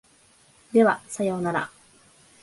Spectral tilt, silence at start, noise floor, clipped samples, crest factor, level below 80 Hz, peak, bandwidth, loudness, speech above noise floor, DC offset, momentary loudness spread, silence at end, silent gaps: -6 dB/octave; 0.75 s; -58 dBFS; under 0.1%; 20 dB; -68 dBFS; -8 dBFS; 11.5 kHz; -24 LUFS; 35 dB; under 0.1%; 9 LU; 0.75 s; none